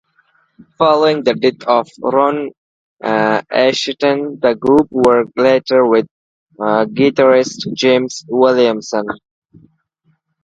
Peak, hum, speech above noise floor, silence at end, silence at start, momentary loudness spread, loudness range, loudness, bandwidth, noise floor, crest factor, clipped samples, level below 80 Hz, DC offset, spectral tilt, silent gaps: 0 dBFS; none; 48 dB; 1.25 s; 0.8 s; 9 LU; 2 LU; -14 LUFS; 9 kHz; -61 dBFS; 14 dB; under 0.1%; -56 dBFS; under 0.1%; -5 dB/octave; 2.58-2.97 s, 6.11-6.47 s